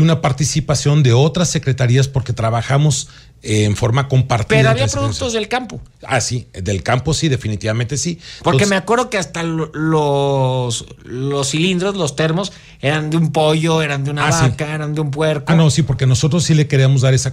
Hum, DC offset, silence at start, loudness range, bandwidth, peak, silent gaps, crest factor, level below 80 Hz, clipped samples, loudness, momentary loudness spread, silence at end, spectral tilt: none; under 0.1%; 0 s; 3 LU; 13 kHz; -2 dBFS; none; 14 dB; -40 dBFS; under 0.1%; -16 LUFS; 8 LU; 0 s; -5 dB/octave